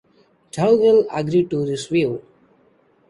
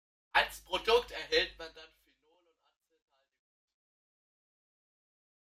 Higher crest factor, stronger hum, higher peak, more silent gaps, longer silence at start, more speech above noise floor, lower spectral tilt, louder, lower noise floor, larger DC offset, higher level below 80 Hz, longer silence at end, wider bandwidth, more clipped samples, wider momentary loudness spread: second, 16 dB vs 24 dB; neither; first, -4 dBFS vs -14 dBFS; neither; first, 0.55 s vs 0.35 s; about the same, 40 dB vs 40 dB; first, -6.5 dB/octave vs -1.5 dB/octave; first, -18 LUFS vs -31 LUFS; second, -58 dBFS vs -73 dBFS; neither; about the same, -58 dBFS vs -62 dBFS; second, 0.9 s vs 3.75 s; second, 11 kHz vs 15.5 kHz; neither; about the same, 11 LU vs 13 LU